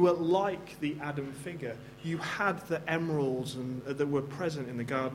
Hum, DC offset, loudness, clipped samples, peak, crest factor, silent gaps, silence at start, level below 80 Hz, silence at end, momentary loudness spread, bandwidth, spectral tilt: none; under 0.1%; -33 LUFS; under 0.1%; -14 dBFS; 18 dB; none; 0 s; -66 dBFS; 0 s; 10 LU; 16 kHz; -6.5 dB/octave